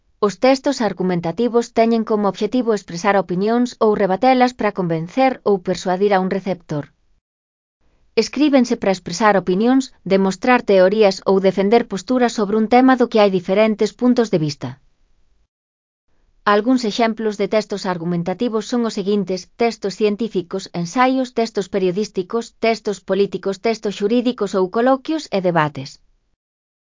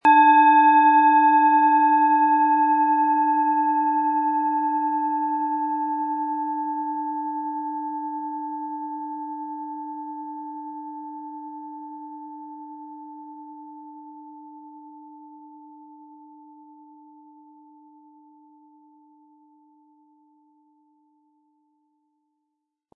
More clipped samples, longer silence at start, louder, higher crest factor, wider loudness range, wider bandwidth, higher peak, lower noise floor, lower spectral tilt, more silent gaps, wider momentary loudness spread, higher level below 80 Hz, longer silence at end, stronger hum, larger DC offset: neither; first, 0.2 s vs 0.05 s; about the same, -18 LUFS vs -20 LUFS; about the same, 18 dB vs 18 dB; second, 5 LU vs 25 LU; first, 7.6 kHz vs 3.8 kHz; first, 0 dBFS vs -6 dBFS; second, -56 dBFS vs -81 dBFS; about the same, -6 dB/octave vs -5 dB/octave; first, 7.21-7.80 s, 15.48-16.08 s vs none; second, 8 LU vs 25 LU; first, -56 dBFS vs -86 dBFS; second, 1.05 s vs 7.3 s; neither; neither